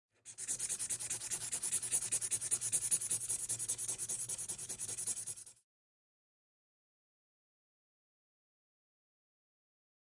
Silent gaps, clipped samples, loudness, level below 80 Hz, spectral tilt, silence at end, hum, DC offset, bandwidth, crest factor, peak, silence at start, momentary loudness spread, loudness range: none; under 0.1%; -36 LUFS; -76 dBFS; 0 dB/octave; 4.55 s; none; under 0.1%; 11.5 kHz; 24 dB; -18 dBFS; 0.25 s; 8 LU; 11 LU